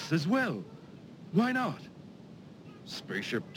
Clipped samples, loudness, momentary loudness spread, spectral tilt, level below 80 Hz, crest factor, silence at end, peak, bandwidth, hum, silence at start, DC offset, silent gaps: under 0.1%; -32 LUFS; 22 LU; -6 dB/octave; -74 dBFS; 18 dB; 0 s; -16 dBFS; 16.5 kHz; none; 0 s; under 0.1%; none